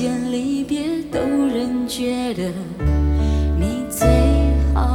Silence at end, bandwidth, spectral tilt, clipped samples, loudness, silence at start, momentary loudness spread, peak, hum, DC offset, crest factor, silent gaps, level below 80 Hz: 0 s; 16 kHz; -6.5 dB/octave; under 0.1%; -20 LUFS; 0 s; 7 LU; -2 dBFS; none; under 0.1%; 16 dB; none; -22 dBFS